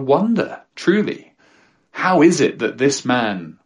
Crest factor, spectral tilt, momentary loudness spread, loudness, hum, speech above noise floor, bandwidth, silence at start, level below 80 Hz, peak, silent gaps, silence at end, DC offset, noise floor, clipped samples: 16 dB; -5 dB/octave; 12 LU; -18 LUFS; none; 38 dB; 11.5 kHz; 0 s; -64 dBFS; -2 dBFS; none; 0.15 s; under 0.1%; -55 dBFS; under 0.1%